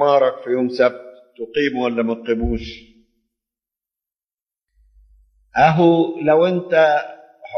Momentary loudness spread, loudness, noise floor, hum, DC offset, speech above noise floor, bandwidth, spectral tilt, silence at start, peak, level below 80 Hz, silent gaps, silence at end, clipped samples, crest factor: 12 LU; -18 LUFS; under -90 dBFS; none; under 0.1%; over 73 dB; 6.4 kHz; -7.5 dB/octave; 0 s; -2 dBFS; -40 dBFS; 4.34-4.38 s; 0 s; under 0.1%; 18 dB